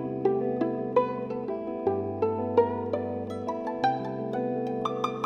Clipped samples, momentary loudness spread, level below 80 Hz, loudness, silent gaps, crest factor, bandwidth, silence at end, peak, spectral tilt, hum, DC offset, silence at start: under 0.1%; 7 LU; -66 dBFS; -29 LUFS; none; 18 dB; 7.2 kHz; 0 s; -10 dBFS; -7.5 dB/octave; none; under 0.1%; 0 s